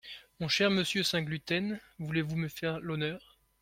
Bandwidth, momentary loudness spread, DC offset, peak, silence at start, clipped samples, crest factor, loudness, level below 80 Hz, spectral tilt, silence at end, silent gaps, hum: 16.5 kHz; 12 LU; under 0.1%; -14 dBFS; 0.05 s; under 0.1%; 20 dB; -32 LUFS; -64 dBFS; -4.5 dB/octave; 0.45 s; none; none